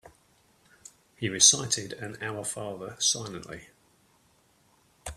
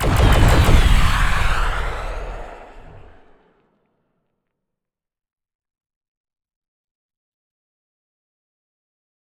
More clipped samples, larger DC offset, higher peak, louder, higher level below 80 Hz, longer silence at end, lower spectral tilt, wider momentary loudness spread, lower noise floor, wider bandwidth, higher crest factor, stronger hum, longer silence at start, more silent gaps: neither; neither; about the same, -2 dBFS vs 0 dBFS; second, -25 LUFS vs -18 LUFS; second, -60 dBFS vs -22 dBFS; second, 0 s vs 6.2 s; second, -1 dB/octave vs -5 dB/octave; first, 23 LU vs 19 LU; second, -65 dBFS vs -84 dBFS; about the same, 15 kHz vs 15 kHz; first, 30 dB vs 20 dB; neither; about the same, 0.05 s vs 0 s; neither